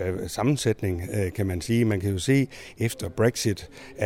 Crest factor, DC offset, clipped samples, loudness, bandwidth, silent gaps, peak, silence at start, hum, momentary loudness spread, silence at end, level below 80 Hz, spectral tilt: 16 dB; under 0.1%; under 0.1%; -26 LUFS; 16.5 kHz; none; -8 dBFS; 0 s; none; 7 LU; 0 s; -48 dBFS; -5.5 dB/octave